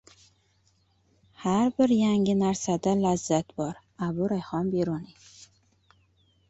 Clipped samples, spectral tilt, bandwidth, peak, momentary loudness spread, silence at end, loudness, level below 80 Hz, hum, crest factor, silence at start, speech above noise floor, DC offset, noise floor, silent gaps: under 0.1%; -6 dB/octave; 8.2 kHz; -10 dBFS; 11 LU; 1.45 s; -26 LUFS; -60 dBFS; none; 18 dB; 1.4 s; 41 dB; under 0.1%; -67 dBFS; none